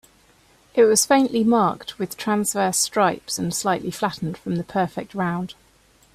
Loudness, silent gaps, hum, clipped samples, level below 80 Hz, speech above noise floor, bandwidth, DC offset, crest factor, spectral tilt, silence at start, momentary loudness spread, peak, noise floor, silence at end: -21 LUFS; none; none; under 0.1%; -58 dBFS; 35 dB; 16 kHz; under 0.1%; 18 dB; -4 dB/octave; 0.75 s; 11 LU; -4 dBFS; -57 dBFS; 0.6 s